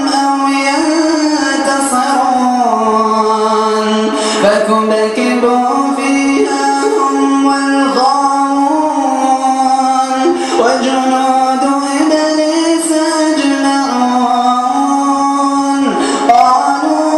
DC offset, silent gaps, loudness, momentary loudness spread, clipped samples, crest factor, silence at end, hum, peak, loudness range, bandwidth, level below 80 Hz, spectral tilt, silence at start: under 0.1%; none; -11 LUFS; 2 LU; under 0.1%; 10 dB; 0 s; none; 0 dBFS; 0 LU; 12.5 kHz; -56 dBFS; -3 dB/octave; 0 s